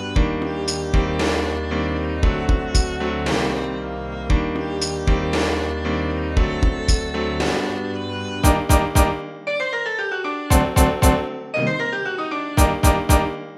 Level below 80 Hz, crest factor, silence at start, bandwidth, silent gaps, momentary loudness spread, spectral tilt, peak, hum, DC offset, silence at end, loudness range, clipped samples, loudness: -24 dBFS; 18 dB; 0 s; 16 kHz; none; 8 LU; -5 dB/octave; -2 dBFS; none; under 0.1%; 0 s; 3 LU; under 0.1%; -21 LUFS